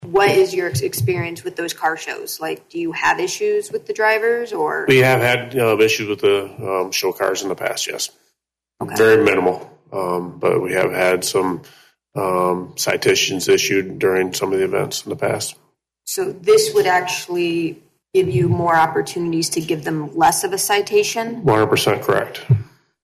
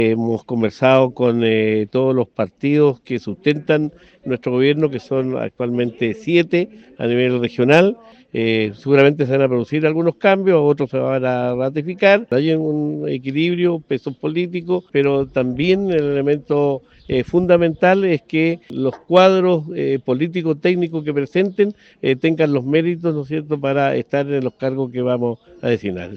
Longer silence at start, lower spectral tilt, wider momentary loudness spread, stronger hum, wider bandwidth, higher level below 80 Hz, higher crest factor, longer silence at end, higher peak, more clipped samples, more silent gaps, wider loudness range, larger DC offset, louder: about the same, 0 s vs 0 s; second, -4 dB/octave vs -8 dB/octave; about the same, 11 LU vs 9 LU; neither; first, 15.5 kHz vs 7 kHz; about the same, -56 dBFS vs -56 dBFS; about the same, 14 dB vs 18 dB; first, 0.4 s vs 0 s; second, -4 dBFS vs 0 dBFS; neither; neither; about the same, 3 LU vs 3 LU; neither; about the same, -18 LUFS vs -18 LUFS